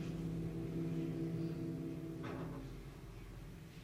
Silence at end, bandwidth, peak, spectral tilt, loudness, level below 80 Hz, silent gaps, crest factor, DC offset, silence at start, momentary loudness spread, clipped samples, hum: 0 s; 15.5 kHz; -32 dBFS; -8 dB/octave; -44 LUFS; -58 dBFS; none; 12 dB; under 0.1%; 0 s; 12 LU; under 0.1%; none